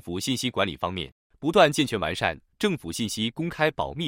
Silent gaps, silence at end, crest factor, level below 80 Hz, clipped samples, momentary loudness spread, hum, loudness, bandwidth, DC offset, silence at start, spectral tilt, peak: 1.12-1.30 s; 0 s; 20 dB; -54 dBFS; under 0.1%; 11 LU; none; -26 LUFS; 16.5 kHz; under 0.1%; 0.05 s; -4.5 dB/octave; -6 dBFS